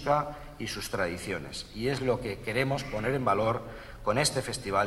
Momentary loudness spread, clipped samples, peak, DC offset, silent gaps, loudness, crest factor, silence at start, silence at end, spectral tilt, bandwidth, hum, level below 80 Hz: 9 LU; under 0.1%; -12 dBFS; under 0.1%; none; -31 LUFS; 18 dB; 0 s; 0 s; -4.5 dB/octave; 16 kHz; none; -50 dBFS